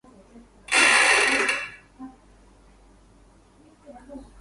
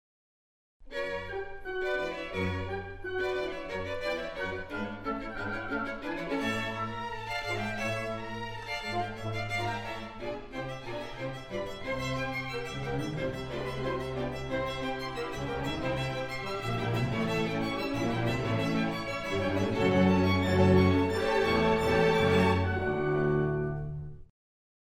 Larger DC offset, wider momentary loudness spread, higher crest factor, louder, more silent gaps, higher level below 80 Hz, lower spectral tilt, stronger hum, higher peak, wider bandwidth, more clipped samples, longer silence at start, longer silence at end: neither; first, 28 LU vs 12 LU; about the same, 20 dB vs 20 dB; first, -18 LUFS vs -31 LUFS; neither; second, -56 dBFS vs -48 dBFS; second, 0.5 dB/octave vs -6.5 dB/octave; neither; first, -6 dBFS vs -10 dBFS; second, 11.5 kHz vs 16.5 kHz; neither; about the same, 0.7 s vs 0.8 s; second, 0.2 s vs 0.65 s